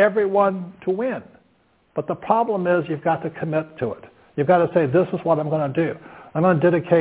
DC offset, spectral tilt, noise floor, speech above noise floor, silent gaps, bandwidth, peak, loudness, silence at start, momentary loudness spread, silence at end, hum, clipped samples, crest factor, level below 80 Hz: under 0.1%; -11.5 dB/octave; -61 dBFS; 41 dB; none; 4 kHz; -4 dBFS; -21 LUFS; 0 s; 12 LU; 0 s; none; under 0.1%; 18 dB; -60 dBFS